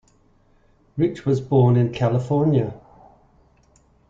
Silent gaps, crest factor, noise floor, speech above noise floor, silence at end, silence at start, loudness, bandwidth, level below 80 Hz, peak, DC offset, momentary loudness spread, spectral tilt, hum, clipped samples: none; 16 dB; -58 dBFS; 39 dB; 1.3 s; 0.95 s; -20 LUFS; 7.6 kHz; -54 dBFS; -6 dBFS; under 0.1%; 7 LU; -9.5 dB/octave; none; under 0.1%